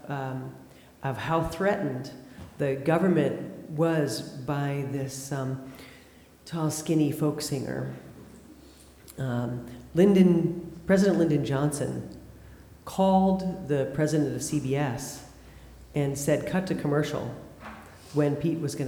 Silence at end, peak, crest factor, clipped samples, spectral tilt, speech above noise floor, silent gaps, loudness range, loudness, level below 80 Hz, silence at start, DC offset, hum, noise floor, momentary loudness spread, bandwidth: 0 s; -8 dBFS; 20 dB; under 0.1%; -6.5 dB/octave; 27 dB; none; 6 LU; -27 LUFS; -54 dBFS; 0.05 s; under 0.1%; none; -53 dBFS; 20 LU; over 20 kHz